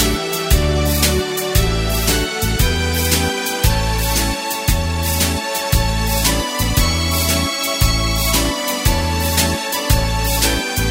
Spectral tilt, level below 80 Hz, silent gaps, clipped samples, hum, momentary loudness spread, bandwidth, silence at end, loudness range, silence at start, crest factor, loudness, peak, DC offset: -3.5 dB/octave; -22 dBFS; none; under 0.1%; none; 3 LU; 16.5 kHz; 0 s; 1 LU; 0 s; 16 dB; -17 LUFS; 0 dBFS; under 0.1%